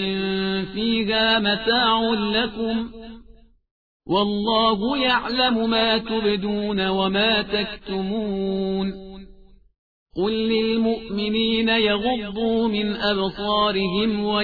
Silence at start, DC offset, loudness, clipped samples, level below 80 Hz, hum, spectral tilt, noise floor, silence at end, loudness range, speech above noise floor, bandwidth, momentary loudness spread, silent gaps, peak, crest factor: 0 s; 0.3%; -21 LUFS; under 0.1%; -46 dBFS; none; -7.5 dB/octave; -50 dBFS; 0 s; 4 LU; 28 dB; 4.9 kHz; 7 LU; 3.71-4.00 s, 9.79-10.06 s; -6 dBFS; 16 dB